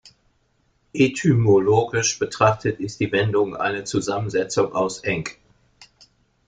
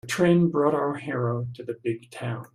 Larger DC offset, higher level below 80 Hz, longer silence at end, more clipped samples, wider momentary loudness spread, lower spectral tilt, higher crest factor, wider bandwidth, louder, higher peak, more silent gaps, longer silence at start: neither; first, -54 dBFS vs -62 dBFS; first, 1.15 s vs 0.1 s; neither; second, 9 LU vs 13 LU; second, -5 dB/octave vs -7 dB/octave; about the same, 20 dB vs 18 dB; second, 9.4 kHz vs 14 kHz; first, -21 LUFS vs -25 LUFS; first, -2 dBFS vs -8 dBFS; neither; first, 0.95 s vs 0.05 s